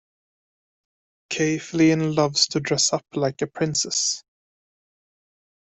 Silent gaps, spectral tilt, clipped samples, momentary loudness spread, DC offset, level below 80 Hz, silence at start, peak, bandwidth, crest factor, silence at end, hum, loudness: none; -3.5 dB/octave; under 0.1%; 7 LU; under 0.1%; -62 dBFS; 1.3 s; -6 dBFS; 8.4 kHz; 20 dB; 1.4 s; none; -22 LUFS